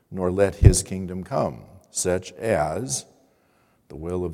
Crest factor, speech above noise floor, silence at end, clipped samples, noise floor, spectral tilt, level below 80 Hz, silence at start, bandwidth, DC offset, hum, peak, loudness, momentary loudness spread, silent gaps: 24 dB; 41 dB; 0 s; under 0.1%; -63 dBFS; -5.5 dB/octave; -32 dBFS; 0.1 s; 15.5 kHz; under 0.1%; none; 0 dBFS; -23 LUFS; 14 LU; none